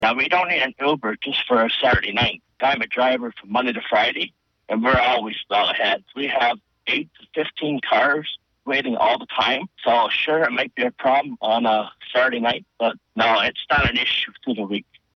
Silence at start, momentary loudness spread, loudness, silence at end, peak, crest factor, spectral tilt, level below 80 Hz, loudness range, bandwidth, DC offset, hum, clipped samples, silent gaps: 0 s; 8 LU; -21 LUFS; 0.35 s; -6 dBFS; 14 dB; -5.5 dB/octave; -46 dBFS; 2 LU; 6.4 kHz; under 0.1%; none; under 0.1%; none